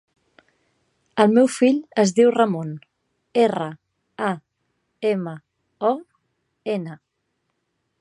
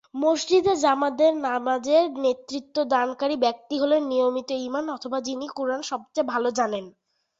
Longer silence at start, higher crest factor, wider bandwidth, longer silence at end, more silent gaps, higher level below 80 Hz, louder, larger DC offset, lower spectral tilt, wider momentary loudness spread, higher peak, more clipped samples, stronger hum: first, 1.15 s vs 0.15 s; first, 22 dB vs 16 dB; first, 11.5 kHz vs 8 kHz; first, 1.05 s vs 0.5 s; neither; second, -74 dBFS vs -66 dBFS; first, -21 LUFS vs -24 LUFS; neither; first, -5.5 dB/octave vs -3 dB/octave; first, 17 LU vs 9 LU; first, -2 dBFS vs -8 dBFS; neither; neither